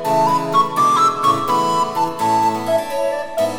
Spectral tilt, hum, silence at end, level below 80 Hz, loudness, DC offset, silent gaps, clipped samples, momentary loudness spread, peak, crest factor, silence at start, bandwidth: -4.5 dB/octave; none; 0 s; -56 dBFS; -17 LUFS; under 0.1%; none; under 0.1%; 6 LU; -4 dBFS; 14 dB; 0 s; over 20 kHz